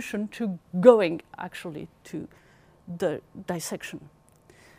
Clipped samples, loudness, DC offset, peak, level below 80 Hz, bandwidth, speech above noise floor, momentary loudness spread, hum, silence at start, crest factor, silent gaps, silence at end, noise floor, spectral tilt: under 0.1%; -25 LUFS; under 0.1%; -2 dBFS; -66 dBFS; 15.5 kHz; 30 dB; 22 LU; none; 0 s; 24 dB; none; 0.7 s; -56 dBFS; -6 dB/octave